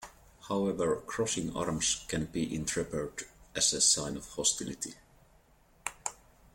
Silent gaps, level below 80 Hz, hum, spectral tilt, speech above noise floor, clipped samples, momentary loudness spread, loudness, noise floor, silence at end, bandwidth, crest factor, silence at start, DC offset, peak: none; -56 dBFS; none; -2.5 dB/octave; 31 dB; under 0.1%; 16 LU; -31 LUFS; -64 dBFS; 0.4 s; 16.5 kHz; 22 dB; 0 s; under 0.1%; -12 dBFS